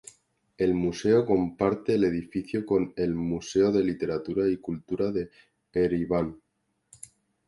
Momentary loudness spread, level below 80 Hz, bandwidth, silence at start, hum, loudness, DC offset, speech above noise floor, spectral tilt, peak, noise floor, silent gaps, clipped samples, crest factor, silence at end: 10 LU; -54 dBFS; 11.5 kHz; 0.6 s; none; -27 LUFS; under 0.1%; 37 dB; -7 dB/octave; -10 dBFS; -63 dBFS; none; under 0.1%; 18 dB; 1.1 s